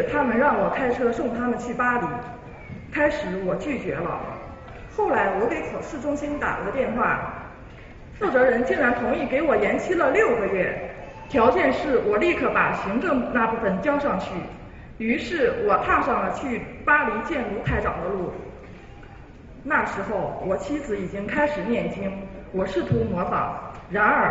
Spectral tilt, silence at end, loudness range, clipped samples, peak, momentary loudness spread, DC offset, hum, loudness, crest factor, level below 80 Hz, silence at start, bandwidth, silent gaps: -6.5 dB/octave; 0 s; 5 LU; under 0.1%; -6 dBFS; 16 LU; under 0.1%; none; -23 LUFS; 18 dB; -44 dBFS; 0 s; 8 kHz; none